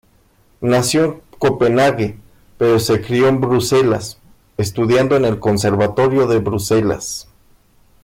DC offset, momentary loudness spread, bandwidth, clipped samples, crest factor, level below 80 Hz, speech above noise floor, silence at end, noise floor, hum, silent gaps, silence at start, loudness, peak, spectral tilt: under 0.1%; 10 LU; 16.5 kHz; under 0.1%; 10 dB; -46 dBFS; 39 dB; 0.8 s; -54 dBFS; none; none; 0.6 s; -16 LUFS; -6 dBFS; -5.5 dB/octave